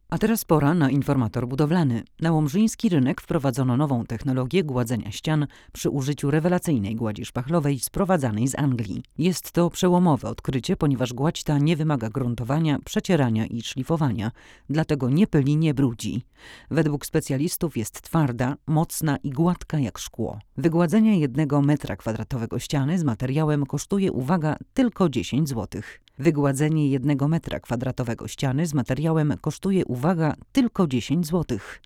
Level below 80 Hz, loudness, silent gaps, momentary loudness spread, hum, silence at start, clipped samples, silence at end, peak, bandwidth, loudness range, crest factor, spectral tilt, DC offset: -48 dBFS; -24 LUFS; none; 8 LU; none; 0.1 s; under 0.1%; 0.1 s; -6 dBFS; 17 kHz; 2 LU; 18 dB; -6.5 dB/octave; under 0.1%